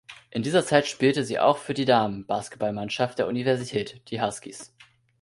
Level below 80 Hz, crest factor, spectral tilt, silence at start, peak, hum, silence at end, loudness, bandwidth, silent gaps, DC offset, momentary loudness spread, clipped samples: -62 dBFS; 20 dB; -5 dB/octave; 0.1 s; -6 dBFS; none; 0.55 s; -25 LUFS; 11.5 kHz; none; under 0.1%; 11 LU; under 0.1%